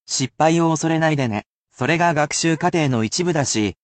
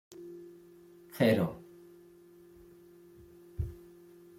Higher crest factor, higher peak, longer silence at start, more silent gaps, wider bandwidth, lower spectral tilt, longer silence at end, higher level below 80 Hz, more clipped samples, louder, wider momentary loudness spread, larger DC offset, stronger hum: second, 14 dB vs 24 dB; first, -4 dBFS vs -14 dBFS; about the same, 0.1 s vs 0.1 s; first, 1.46-1.63 s vs none; second, 9.2 kHz vs 16.5 kHz; second, -4.5 dB/octave vs -7 dB/octave; second, 0.1 s vs 0.6 s; about the same, -56 dBFS vs -56 dBFS; neither; first, -19 LUFS vs -32 LUFS; second, 6 LU vs 29 LU; neither; neither